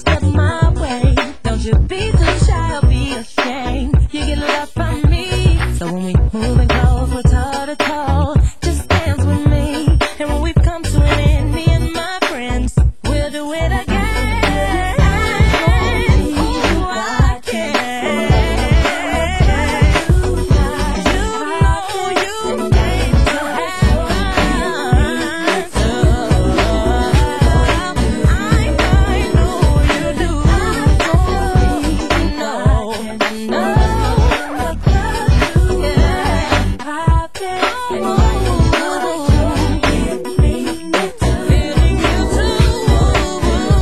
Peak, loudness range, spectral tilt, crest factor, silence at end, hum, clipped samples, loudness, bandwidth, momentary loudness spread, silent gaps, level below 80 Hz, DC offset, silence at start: 0 dBFS; 2 LU; -6 dB/octave; 14 dB; 0 s; none; under 0.1%; -15 LUFS; 12.5 kHz; 5 LU; none; -18 dBFS; 3%; 0 s